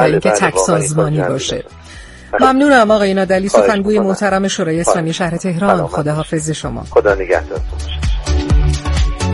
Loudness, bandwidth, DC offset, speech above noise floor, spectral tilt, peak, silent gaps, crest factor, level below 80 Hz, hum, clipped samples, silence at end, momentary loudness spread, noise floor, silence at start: -14 LUFS; 11.5 kHz; under 0.1%; 21 dB; -5 dB/octave; 0 dBFS; none; 14 dB; -22 dBFS; none; under 0.1%; 0 s; 10 LU; -34 dBFS; 0 s